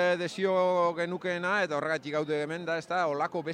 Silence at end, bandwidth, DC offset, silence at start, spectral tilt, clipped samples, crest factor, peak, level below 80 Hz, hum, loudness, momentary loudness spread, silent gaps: 0 s; 10.5 kHz; under 0.1%; 0 s; -5 dB/octave; under 0.1%; 14 dB; -16 dBFS; -78 dBFS; none; -29 LUFS; 6 LU; none